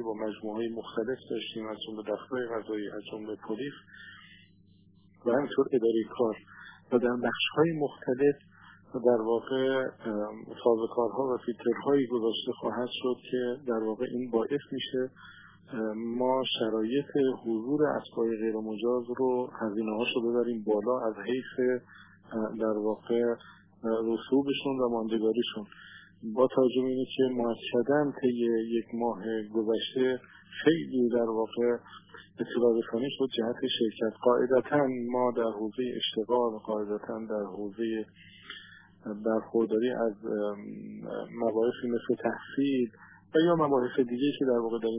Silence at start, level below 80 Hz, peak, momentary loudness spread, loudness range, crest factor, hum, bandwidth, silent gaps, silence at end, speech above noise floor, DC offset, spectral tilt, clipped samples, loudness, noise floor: 0 s; -74 dBFS; -10 dBFS; 11 LU; 4 LU; 20 dB; none; 3.8 kHz; none; 0 s; 31 dB; under 0.1%; -9.5 dB/octave; under 0.1%; -30 LUFS; -60 dBFS